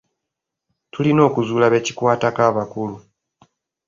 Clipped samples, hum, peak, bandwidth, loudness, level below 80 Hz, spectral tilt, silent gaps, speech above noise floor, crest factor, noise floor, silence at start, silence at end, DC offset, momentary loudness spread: under 0.1%; none; -2 dBFS; 7.6 kHz; -18 LUFS; -58 dBFS; -6 dB/octave; none; 65 dB; 18 dB; -82 dBFS; 0.95 s; 0.9 s; under 0.1%; 12 LU